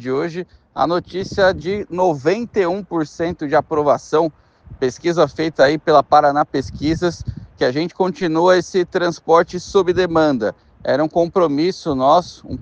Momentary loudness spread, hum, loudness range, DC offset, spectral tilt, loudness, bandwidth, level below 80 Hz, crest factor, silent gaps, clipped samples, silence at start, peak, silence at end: 9 LU; none; 3 LU; under 0.1%; -6 dB/octave; -17 LUFS; 8.4 kHz; -46 dBFS; 18 dB; none; under 0.1%; 0 s; 0 dBFS; 0 s